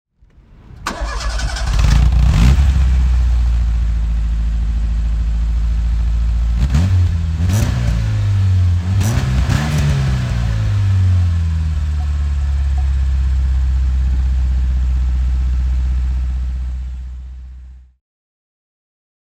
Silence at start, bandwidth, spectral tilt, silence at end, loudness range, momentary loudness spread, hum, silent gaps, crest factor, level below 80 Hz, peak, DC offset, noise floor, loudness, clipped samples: 0.7 s; 9.4 kHz; -6.5 dB/octave; 1.6 s; 5 LU; 8 LU; none; none; 16 dB; -16 dBFS; 0 dBFS; under 0.1%; -46 dBFS; -17 LUFS; under 0.1%